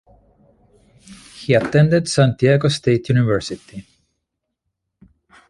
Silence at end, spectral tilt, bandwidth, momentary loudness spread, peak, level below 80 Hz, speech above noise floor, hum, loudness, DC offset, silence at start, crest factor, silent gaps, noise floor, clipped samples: 1.7 s; -6.5 dB/octave; 11.5 kHz; 17 LU; -2 dBFS; -50 dBFS; 61 dB; none; -17 LUFS; under 0.1%; 1.1 s; 18 dB; none; -78 dBFS; under 0.1%